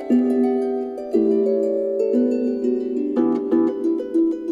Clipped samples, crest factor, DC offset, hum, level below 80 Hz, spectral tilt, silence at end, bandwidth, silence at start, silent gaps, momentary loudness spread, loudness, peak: under 0.1%; 12 dB; under 0.1%; none; -62 dBFS; -8.5 dB/octave; 0 s; 7.6 kHz; 0 s; none; 4 LU; -20 LUFS; -8 dBFS